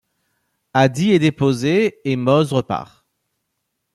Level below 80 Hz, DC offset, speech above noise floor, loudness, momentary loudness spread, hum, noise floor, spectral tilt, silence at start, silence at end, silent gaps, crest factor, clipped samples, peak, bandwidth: -58 dBFS; under 0.1%; 58 dB; -18 LUFS; 7 LU; none; -75 dBFS; -6.5 dB/octave; 0.75 s; 1.1 s; none; 16 dB; under 0.1%; -2 dBFS; 12.5 kHz